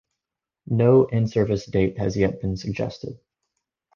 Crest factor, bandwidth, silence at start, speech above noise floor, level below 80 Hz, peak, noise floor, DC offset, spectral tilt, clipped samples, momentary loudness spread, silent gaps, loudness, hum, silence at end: 20 dB; 7.2 kHz; 0.7 s; 65 dB; -46 dBFS; -4 dBFS; -87 dBFS; under 0.1%; -8 dB/octave; under 0.1%; 12 LU; none; -22 LUFS; none; 0.8 s